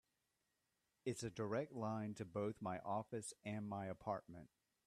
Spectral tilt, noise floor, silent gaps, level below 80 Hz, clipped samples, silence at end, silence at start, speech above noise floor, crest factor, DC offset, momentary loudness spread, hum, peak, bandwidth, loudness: -6 dB/octave; -87 dBFS; none; -80 dBFS; under 0.1%; 0.4 s; 1.05 s; 42 dB; 18 dB; under 0.1%; 5 LU; none; -30 dBFS; 13.5 kHz; -47 LUFS